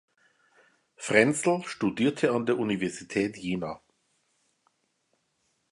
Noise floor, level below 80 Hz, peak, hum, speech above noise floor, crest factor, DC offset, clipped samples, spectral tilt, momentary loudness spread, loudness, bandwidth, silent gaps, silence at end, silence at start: -75 dBFS; -66 dBFS; -6 dBFS; none; 48 dB; 24 dB; under 0.1%; under 0.1%; -5 dB/octave; 11 LU; -27 LUFS; 11.5 kHz; none; 1.95 s; 1 s